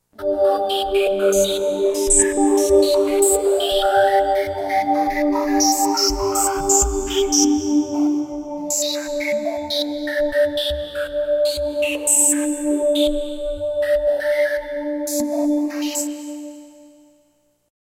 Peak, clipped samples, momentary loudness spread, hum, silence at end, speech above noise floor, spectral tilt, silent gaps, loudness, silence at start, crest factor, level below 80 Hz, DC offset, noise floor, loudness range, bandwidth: -2 dBFS; under 0.1%; 9 LU; none; 1.15 s; 45 dB; -2 dB/octave; none; -19 LUFS; 0.2 s; 18 dB; -38 dBFS; under 0.1%; -62 dBFS; 5 LU; 16 kHz